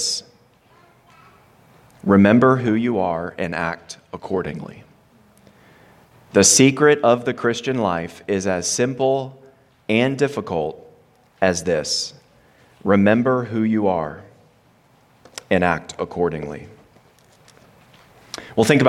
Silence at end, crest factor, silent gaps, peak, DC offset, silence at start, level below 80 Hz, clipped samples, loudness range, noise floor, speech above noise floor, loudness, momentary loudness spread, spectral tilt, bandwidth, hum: 0 s; 20 dB; none; -2 dBFS; under 0.1%; 0 s; -56 dBFS; under 0.1%; 8 LU; -56 dBFS; 37 dB; -19 LUFS; 20 LU; -4 dB/octave; 15.5 kHz; none